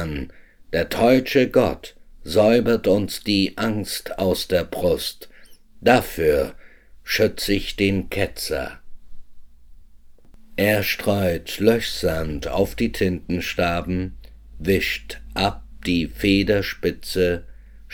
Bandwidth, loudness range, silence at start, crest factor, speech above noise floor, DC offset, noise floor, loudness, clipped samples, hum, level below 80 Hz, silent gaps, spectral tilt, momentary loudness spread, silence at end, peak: 19.5 kHz; 5 LU; 0 s; 20 dB; 24 dB; under 0.1%; -44 dBFS; -21 LUFS; under 0.1%; none; -40 dBFS; none; -5 dB/octave; 12 LU; 0 s; -2 dBFS